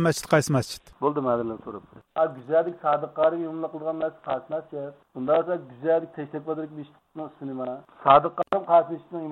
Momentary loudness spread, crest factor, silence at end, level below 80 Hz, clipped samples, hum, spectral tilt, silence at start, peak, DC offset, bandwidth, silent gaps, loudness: 16 LU; 20 dB; 0 s; -62 dBFS; under 0.1%; none; -6 dB/octave; 0 s; -6 dBFS; under 0.1%; 15.5 kHz; none; -25 LUFS